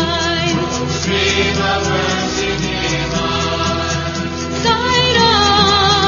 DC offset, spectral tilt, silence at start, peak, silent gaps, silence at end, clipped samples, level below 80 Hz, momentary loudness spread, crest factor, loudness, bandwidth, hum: under 0.1%; -3.5 dB/octave; 0 s; 0 dBFS; none; 0 s; under 0.1%; -32 dBFS; 8 LU; 16 dB; -15 LUFS; 7.4 kHz; none